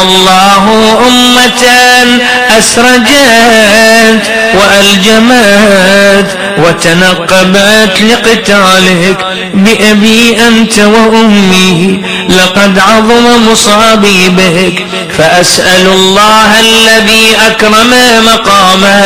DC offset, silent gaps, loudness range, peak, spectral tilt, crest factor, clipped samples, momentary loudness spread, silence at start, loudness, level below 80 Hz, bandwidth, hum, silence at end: 4%; none; 2 LU; 0 dBFS; -3 dB/octave; 4 dB; 10%; 4 LU; 0 s; -3 LUFS; -32 dBFS; over 20 kHz; none; 0 s